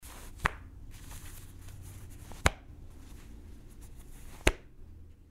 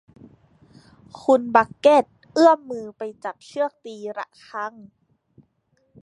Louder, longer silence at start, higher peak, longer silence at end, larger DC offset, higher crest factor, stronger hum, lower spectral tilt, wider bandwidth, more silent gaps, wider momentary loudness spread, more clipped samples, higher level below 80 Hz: second, -34 LUFS vs -21 LUFS; second, 0 s vs 1.15 s; about the same, -2 dBFS vs 0 dBFS; second, 0 s vs 1.35 s; neither; first, 36 dB vs 22 dB; neither; second, -3.5 dB/octave vs -5 dB/octave; first, 16 kHz vs 11 kHz; neither; first, 21 LU vs 17 LU; neither; first, -44 dBFS vs -68 dBFS